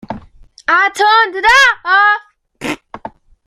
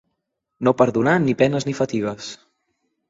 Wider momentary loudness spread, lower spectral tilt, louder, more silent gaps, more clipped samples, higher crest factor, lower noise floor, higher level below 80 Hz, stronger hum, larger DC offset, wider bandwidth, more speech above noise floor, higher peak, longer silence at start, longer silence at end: first, 22 LU vs 11 LU; second, -1.5 dB/octave vs -6.5 dB/octave; first, -10 LUFS vs -20 LUFS; neither; neither; second, 14 dB vs 20 dB; second, -41 dBFS vs -77 dBFS; first, -46 dBFS vs -58 dBFS; neither; neither; first, 15 kHz vs 7.8 kHz; second, 30 dB vs 58 dB; about the same, 0 dBFS vs -2 dBFS; second, 0.1 s vs 0.6 s; second, 0.4 s vs 0.75 s